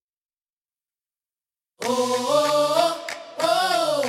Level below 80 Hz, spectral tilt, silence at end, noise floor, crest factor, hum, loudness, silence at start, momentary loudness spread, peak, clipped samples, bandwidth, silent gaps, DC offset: -74 dBFS; -2.5 dB/octave; 0 s; under -90 dBFS; 20 dB; none; -22 LUFS; 1.8 s; 11 LU; -4 dBFS; under 0.1%; 16 kHz; none; under 0.1%